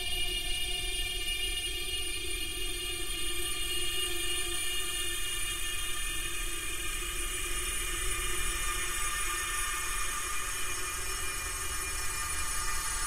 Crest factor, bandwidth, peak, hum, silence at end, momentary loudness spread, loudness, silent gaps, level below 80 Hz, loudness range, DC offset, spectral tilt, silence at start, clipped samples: 12 dB; 16.5 kHz; -20 dBFS; none; 0 s; 3 LU; -32 LUFS; none; -40 dBFS; 1 LU; under 0.1%; -0.5 dB/octave; 0 s; under 0.1%